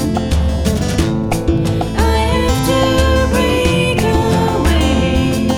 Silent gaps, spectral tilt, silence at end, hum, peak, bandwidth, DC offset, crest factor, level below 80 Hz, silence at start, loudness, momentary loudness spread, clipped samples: none; -5.5 dB/octave; 0 s; none; 0 dBFS; 16.5 kHz; under 0.1%; 12 dB; -20 dBFS; 0 s; -14 LUFS; 3 LU; under 0.1%